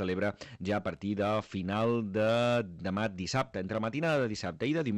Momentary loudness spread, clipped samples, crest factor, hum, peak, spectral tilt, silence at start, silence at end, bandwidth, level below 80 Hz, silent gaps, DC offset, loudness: 6 LU; under 0.1%; 14 dB; none; -18 dBFS; -6 dB/octave; 0 s; 0 s; 12 kHz; -64 dBFS; none; under 0.1%; -32 LUFS